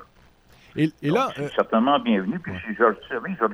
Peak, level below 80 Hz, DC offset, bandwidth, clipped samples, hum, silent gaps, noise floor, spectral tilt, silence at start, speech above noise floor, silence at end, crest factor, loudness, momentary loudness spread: -6 dBFS; -58 dBFS; under 0.1%; 13 kHz; under 0.1%; none; none; -55 dBFS; -7 dB/octave; 0 s; 32 dB; 0 s; 18 dB; -23 LUFS; 10 LU